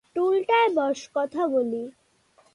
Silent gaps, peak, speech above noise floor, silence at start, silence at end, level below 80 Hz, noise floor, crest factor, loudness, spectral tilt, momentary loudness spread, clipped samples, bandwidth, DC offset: none; -10 dBFS; 38 dB; 0.15 s; 0.65 s; -72 dBFS; -62 dBFS; 16 dB; -24 LUFS; -4 dB/octave; 10 LU; under 0.1%; 11 kHz; under 0.1%